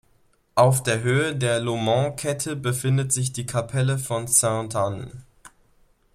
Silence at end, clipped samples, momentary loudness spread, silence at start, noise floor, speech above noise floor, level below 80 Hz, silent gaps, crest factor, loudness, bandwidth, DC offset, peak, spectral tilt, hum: 0.65 s; under 0.1%; 8 LU; 0.55 s; -62 dBFS; 39 dB; -54 dBFS; none; 20 dB; -23 LUFS; 15.5 kHz; under 0.1%; -2 dBFS; -4.5 dB/octave; none